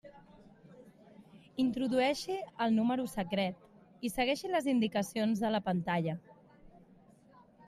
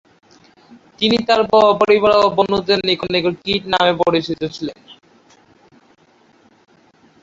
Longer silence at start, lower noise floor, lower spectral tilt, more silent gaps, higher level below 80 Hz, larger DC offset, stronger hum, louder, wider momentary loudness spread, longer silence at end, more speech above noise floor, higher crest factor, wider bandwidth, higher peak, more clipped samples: second, 0.05 s vs 1 s; first, -61 dBFS vs -53 dBFS; about the same, -5.5 dB/octave vs -5.5 dB/octave; neither; second, -66 dBFS vs -52 dBFS; neither; neither; second, -33 LUFS vs -15 LUFS; second, 8 LU vs 12 LU; second, 0.9 s vs 2.3 s; second, 29 dB vs 38 dB; about the same, 16 dB vs 16 dB; first, 15 kHz vs 7.8 kHz; second, -18 dBFS vs -2 dBFS; neither